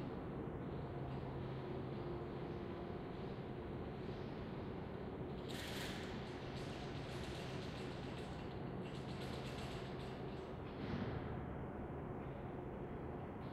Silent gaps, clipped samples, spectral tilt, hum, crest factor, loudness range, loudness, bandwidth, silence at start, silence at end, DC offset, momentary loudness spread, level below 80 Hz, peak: none; under 0.1%; -6.5 dB/octave; none; 16 dB; 1 LU; -47 LUFS; 14.5 kHz; 0 s; 0 s; under 0.1%; 3 LU; -58 dBFS; -30 dBFS